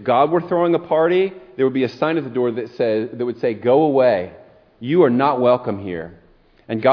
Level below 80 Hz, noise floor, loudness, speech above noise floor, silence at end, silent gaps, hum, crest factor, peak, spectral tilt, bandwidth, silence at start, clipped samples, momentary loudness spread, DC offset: -60 dBFS; -38 dBFS; -18 LUFS; 20 dB; 0 s; none; none; 16 dB; -2 dBFS; -9 dB/octave; 5.4 kHz; 0 s; under 0.1%; 12 LU; under 0.1%